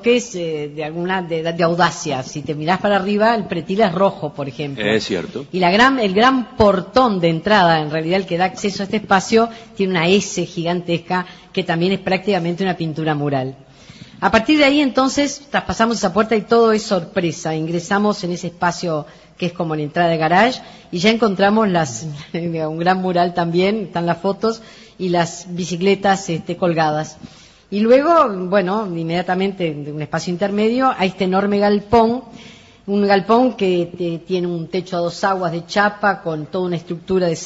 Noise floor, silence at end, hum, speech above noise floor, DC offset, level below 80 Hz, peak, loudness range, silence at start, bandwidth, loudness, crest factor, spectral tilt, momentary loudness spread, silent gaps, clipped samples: -41 dBFS; 0 s; none; 23 dB; under 0.1%; -48 dBFS; -2 dBFS; 4 LU; 0 s; 8 kHz; -18 LUFS; 16 dB; -5.5 dB/octave; 10 LU; none; under 0.1%